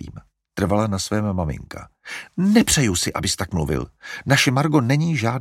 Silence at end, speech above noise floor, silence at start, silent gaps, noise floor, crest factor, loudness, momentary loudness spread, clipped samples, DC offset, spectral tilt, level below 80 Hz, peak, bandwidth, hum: 0 s; 21 dB; 0 s; none; -42 dBFS; 20 dB; -20 LUFS; 17 LU; under 0.1%; under 0.1%; -4.5 dB/octave; -40 dBFS; -2 dBFS; 16.5 kHz; none